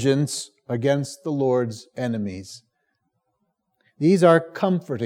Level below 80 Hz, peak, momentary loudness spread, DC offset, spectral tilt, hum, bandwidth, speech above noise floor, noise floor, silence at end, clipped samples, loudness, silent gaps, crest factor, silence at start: -78 dBFS; -4 dBFS; 14 LU; under 0.1%; -6 dB/octave; none; 15.5 kHz; 53 dB; -74 dBFS; 0 s; under 0.1%; -22 LUFS; none; 20 dB; 0 s